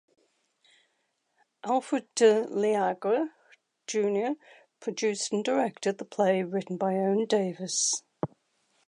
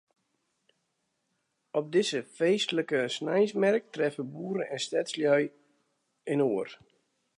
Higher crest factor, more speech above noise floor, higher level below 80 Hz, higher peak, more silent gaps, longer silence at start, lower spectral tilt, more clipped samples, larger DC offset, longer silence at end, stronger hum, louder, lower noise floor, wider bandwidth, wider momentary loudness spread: about the same, 20 dB vs 20 dB; about the same, 49 dB vs 50 dB; first, -78 dBFS vs -84 dBFS; about the same, -10 dBFS vs -12 dBFS; neither; about the same, 1.65 s vs 1.75 s; about the same, -4 dB/octave vs -4.5 dB/octave; neither; neither; about the same, 0.6 s vs 0.6 s; neither; about the same, -28 LUFS vs -29 LUFS; about the same, -76 dBFS vs -79 dBFS; about the same, 11 kHz vs 11 kHz; first, 13 LU vs 9 LU